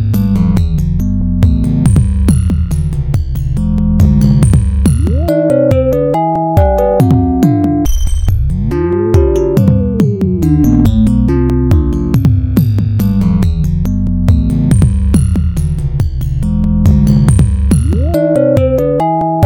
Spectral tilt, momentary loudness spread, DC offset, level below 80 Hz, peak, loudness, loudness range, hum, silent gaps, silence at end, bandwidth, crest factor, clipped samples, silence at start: -8.5 dB/octave; 5 LU; 0.4%; -16 dBFS; 0 dBFS; -11 LUFS; 2 LU; none; none; 0 s; 17 kHz; 10 dB; 0.4%; 0 s